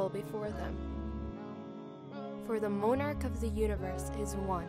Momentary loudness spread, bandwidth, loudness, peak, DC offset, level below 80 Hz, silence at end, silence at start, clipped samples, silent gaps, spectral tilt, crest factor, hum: 13 LU; 16 kHz; -37 LUFS; -18 dBFS; under 0.1%; -44 dBFS; 0 s; 0 s; under 0.1%; none; -7 dB/octave; 16 dB; none